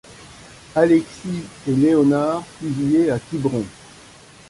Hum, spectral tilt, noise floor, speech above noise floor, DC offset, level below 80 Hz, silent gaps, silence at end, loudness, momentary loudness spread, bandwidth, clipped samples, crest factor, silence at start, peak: none; -7 dB/octave; -45 dBFS; 27 dB; under 0.1%; -52 dBFS; none; 0.8 s; -20 LUFS; 13 LU; 11.5 kHz; under 0.1%; 18 dB; 0.1 s; -2 dBFS